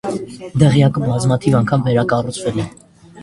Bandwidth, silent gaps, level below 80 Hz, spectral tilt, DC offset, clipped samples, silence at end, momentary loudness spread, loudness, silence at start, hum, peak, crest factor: 11.5 kHz; none; -44 dBFS; -7 dB/octave; under 0.1%; under 0.1%; 0 s; 12 LU; -16 LUFS; 0.05 s; none; 0 dBFS; 16 dB